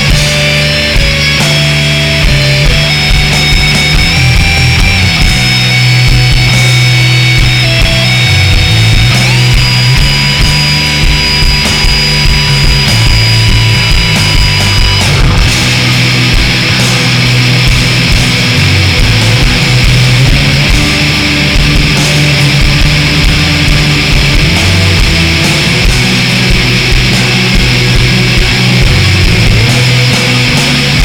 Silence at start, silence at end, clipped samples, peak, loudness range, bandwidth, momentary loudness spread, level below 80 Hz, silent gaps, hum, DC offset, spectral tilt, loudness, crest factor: 0 s; 0 s; under 0.1%; 0 dBFS; 1 LU; 19 kHz; 1 LU; -14 dBFS; none; none; under 0.1%; -4 dB/octave; -6 LUFS; 6 dB